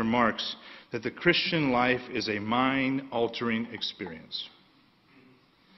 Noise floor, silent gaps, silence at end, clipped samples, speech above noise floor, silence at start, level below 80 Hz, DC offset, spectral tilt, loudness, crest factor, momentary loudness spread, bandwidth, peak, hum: -62 dBFS; none; 1.3 s; under 0.1%; 33 dB; 0 s; -62 dBFS; under 0.1%; -6 dB/octave; -28 LUFS; 22 dB; 12 LU; 6.2 kHz; -8 dBFS; none